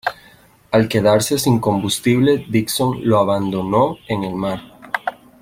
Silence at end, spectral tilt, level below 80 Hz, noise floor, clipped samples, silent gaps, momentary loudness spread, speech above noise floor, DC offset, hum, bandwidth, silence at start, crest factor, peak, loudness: 0.3 s; -5.5 dB/octave; -50 dBFS; -49 dBFS; under 0.1%; none; 10 LU; 32 dB; under 0.1%; none; 16.5 kHz; 0.05 s; 16 dB; -2 dBFS; -18 LUFS